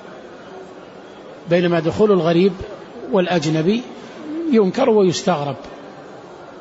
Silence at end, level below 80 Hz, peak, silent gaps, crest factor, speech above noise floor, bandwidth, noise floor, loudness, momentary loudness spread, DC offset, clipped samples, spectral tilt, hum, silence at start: 0 s; -52 dBFS; -4 dBFS; none; 16 dB; 22 dB; 8 kHz; -38 dBFS; -17 LUFS; 23 LU; under 0.1%; under 0.1%; -6.5 dB/octave; none; 0 s